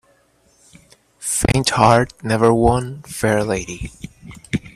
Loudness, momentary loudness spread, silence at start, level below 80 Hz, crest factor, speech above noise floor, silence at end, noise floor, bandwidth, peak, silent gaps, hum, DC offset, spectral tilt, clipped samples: -18 LUFS; 17 LU; 1.2 s; -36 dBFS; 20 dB; 40 dB; 0.05 s; -57 dBFS; 15 kHz; 0 dBFS; none; none; under 0.1%; -5 dB/octave; under 0.1%